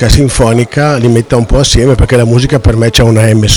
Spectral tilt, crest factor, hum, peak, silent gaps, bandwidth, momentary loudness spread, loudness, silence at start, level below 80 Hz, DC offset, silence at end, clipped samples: -5.5 dB/octave; 6 dB; none; 0 dBFS; none; 16.5 kHz; 3 LU; -8 LUFS; 0 s; -16 dBFS; under 0.1%; 0 s; under 0.1%